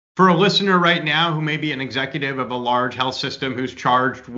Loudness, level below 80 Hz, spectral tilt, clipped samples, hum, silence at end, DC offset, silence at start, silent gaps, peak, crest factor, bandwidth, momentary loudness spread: -19 LUFS; -60 dBFS; -5.5 dB/octave; under 0.1%; none; 0 s; under 0.1%; 0.15 s; none; -2 dBFS; 18 dB; 7.8 kHz; 9 LU